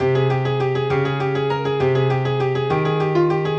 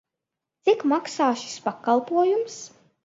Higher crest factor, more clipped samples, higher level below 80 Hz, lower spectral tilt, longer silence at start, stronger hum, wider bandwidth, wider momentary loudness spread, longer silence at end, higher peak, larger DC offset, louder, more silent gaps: about the same, 12 dB vs 16 dB; neither; first, -54 dBFS vs -78 dBFS; first, -8 dB/octave vs -3.5 dB/octave; second, 0 s vs 0.65 s; neither; second, 7.2 kHz vs 8 kHz; second, 3 LU vs 12 LU; second, 0 s vs 0.4 s; about the same, -6 dBFS vs -8 dBFS; first, 0.1% vs under 0.1%; first, -20 LUFS vs -24 LUFS; neither